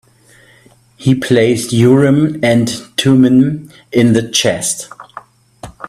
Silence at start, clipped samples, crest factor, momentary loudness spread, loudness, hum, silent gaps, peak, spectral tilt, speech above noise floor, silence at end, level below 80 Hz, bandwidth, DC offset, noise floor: 1 s; under 0.1%; 14 dB; 10 LU; -12 LUFS; none; none; 0 dBFS; -5 dB/octave; 35 dB; 0 s; -48 dBFS; 14 kHz; under 0.1%; -47 dBFS